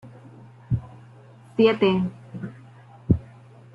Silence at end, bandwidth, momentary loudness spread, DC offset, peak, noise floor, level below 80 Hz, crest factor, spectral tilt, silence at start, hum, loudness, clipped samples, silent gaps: 0.5 s; 5.6 kHz; 22 LU; under 0.1%; -6 dBFS; -48 dBFS; -46 dBFS; 20 dB; -9 dB/octave; 0.05 s; none; -23 LUFS; under 0.1%; none